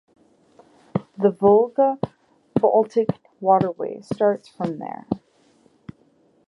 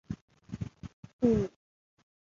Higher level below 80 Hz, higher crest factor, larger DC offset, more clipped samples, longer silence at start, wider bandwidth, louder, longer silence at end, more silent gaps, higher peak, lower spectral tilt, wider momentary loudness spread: second, -60 dBFS vs -54 dBFS; about the same, 18 dB vs 22 dB; neither; neither; first, 0.95 s vs 0.1 s; first, 9.8 kHz vs 7.4 kHz; first, -22 LUFS vs -32 LUFS; first, 1.3 s vs 0.8 s; second, none vs 0.21-0.28 s, 0.93-1.03 s, 1.13-1.19 s; first, -4 dBFS vs -14 dBFS; about the same, -9 dB/octave vs -9 dB/octave; second, 14 LU vs 21 LU